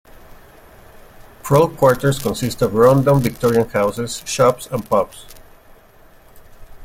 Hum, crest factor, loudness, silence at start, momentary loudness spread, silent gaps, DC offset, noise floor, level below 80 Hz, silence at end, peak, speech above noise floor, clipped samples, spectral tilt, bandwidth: none; 18 dB; -17 LUFS; 1.45 s; 11 LU; none; under 0.1%; -47 dBFS; -44 dBFS; 0 s; 0 dBFS; 30 dB; under 0.1%; -6 dB/octave; 17 kHz